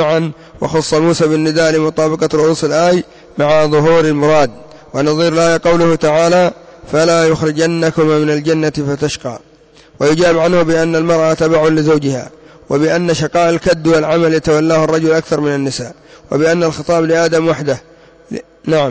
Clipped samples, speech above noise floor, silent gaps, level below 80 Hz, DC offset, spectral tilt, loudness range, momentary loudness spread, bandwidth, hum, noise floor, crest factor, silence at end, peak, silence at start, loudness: under 0.1%; 32 dB; none; -44 dBFS; under 0.1%; -5.5 dB/octave; 2 LU; 9 LU; 8 kHz; none; -44 dBFS; 10 dB; 0 s; -2 dBFS; 0 s; -13 LUFS